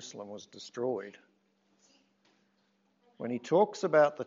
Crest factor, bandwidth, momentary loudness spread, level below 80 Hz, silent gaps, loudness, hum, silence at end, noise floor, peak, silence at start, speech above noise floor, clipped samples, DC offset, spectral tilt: 22 dB; 7.6 kHz; 20 LU; under -90 dBFS; none; -30 LUFS; none; 0 s; -73 dBFS; -12 dBFS; 0 s; 42 dB; under 0.1%; under 0.1%; -4.5 dB/octave